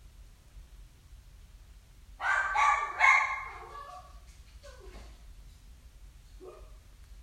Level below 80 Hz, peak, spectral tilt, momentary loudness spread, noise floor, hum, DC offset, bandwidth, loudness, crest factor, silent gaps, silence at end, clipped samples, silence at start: -52 dBFS; -10 dBFS; -1.5 dB/octave; 29 LU; -54 dBFS; none; under 0.1%; 15.5 kHz; -26 LUFS; 24 dB; none; 0 s; under 0.1%; 0.2 s